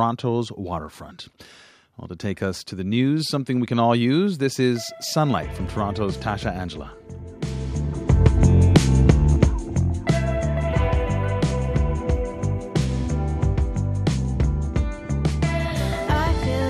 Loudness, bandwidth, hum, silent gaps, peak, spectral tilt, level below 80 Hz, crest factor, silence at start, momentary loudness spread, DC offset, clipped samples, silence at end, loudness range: -22 LUFS; 14.5 kHz; none; none; -2 dBFS; -6.5 dB/octave; -28 dBFS; 20 dB; 0 s; 14 LU; under 0.1%; under 0.1%; 0 s; 7 LU